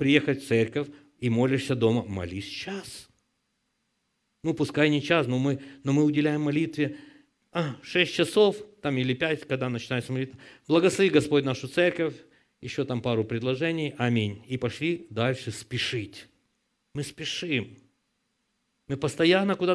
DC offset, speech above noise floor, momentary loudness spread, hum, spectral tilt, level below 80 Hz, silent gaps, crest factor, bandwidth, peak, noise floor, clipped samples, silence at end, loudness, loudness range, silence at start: under 0.1%; 50 dB; 12 LU; none; -6 dB/octave; -64 dBFS; none; 22 dB; 11 kHz; -4 dBFS; -76 dBFS; under 0.1%; 0 s; -27 LUFS; 6 LU; 0 s